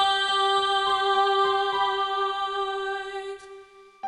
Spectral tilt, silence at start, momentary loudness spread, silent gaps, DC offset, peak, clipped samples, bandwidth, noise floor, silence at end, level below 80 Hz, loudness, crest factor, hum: -1 dB/octave; 0 s; 12 LU; none; under 0.1%; -12 dBFS; under 0.1%; 11 kHz; -48 dBFS; 0 s; -62 dBFS; -24 LUFS; 14 dB; none